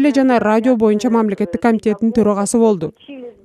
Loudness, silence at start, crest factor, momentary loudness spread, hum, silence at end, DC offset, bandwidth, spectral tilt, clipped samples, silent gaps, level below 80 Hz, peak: -15 LUFS; 0 s; 14 dB; 8 LU; none; 0.15 s; under 0.1%; 13 kHz; -6 dB/octave; under 0.1%; none; -50 dBFS; 0 dBFS